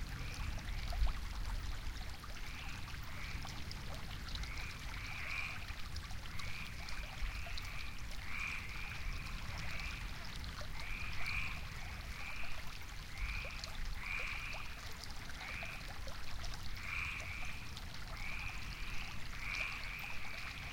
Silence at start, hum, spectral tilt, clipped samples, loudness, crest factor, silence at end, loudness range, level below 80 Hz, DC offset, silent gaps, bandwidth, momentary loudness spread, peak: 0 s; none; -3.5 dB/octave; under 0.1%; -44 LUFS; 18 dB; 0 s; 1 LU; -46 dBFS; under 0.1%; none; 17 kHz; 7 LU; -24 dBFS